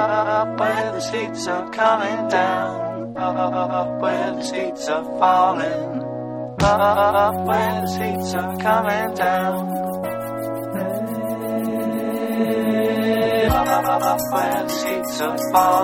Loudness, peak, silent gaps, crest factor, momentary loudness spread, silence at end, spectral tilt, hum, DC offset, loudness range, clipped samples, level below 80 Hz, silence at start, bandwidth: -21 LUFS; -4 dBFS; none; 16 dB; 9 LU; 0 s; -5 dB/octave; none; under 0.1%; 4 LU; under 0.1%; -44 dBFS; 0 s; 17 kHz